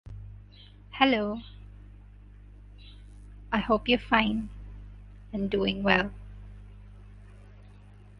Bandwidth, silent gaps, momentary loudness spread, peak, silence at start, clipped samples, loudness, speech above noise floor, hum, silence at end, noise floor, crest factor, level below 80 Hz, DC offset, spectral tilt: 6.2 kHz; none; 26 LU; -4 dBFS; 0.05 s; under 0.1%; -27 LUFS; 24 dB; 50 Hz at -45 dBFS; 0.15 s; -51 dBFS; 26 dB; -46 dBFS; under 0.1%; -7 dB/octave